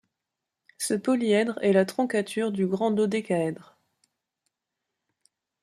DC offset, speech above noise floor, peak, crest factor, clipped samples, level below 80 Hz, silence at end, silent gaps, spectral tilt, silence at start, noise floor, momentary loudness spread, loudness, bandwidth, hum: under 0.1%; 61 dB; -10 dBFS; 18 dB; under 0.1%; -72 dBFS; 2 s; none; -5.5 dB/octave; 0.8 s; -86 dBFS; 6 LU; -25 LUFS; 15 kHz; none